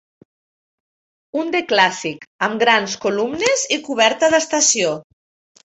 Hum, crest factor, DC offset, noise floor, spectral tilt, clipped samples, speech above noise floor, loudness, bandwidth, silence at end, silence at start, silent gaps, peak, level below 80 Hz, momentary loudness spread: none; 20 dB; under 0.1%; under -90 dBFS; -1.5 dB/octave; under 0.1%; over 72 dB; -17 LUFS; 8.4 kHz; 0.65 s; 1.35 s; 2.27-2.39 s; 0 dBFS; -64 dBFS; 11 LU